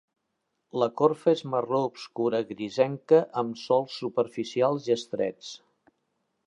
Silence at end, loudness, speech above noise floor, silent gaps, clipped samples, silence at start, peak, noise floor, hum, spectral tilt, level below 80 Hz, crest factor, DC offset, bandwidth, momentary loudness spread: 0.9 s; -27 LUFS; 53 dB; none; under 0.1%; 0.75 s; -8 dBFS; -79 dBFS; none; -6 dB/octave; -78 dBFS; 20 dB; under 0.1%; 10.5 kHz; 10 LU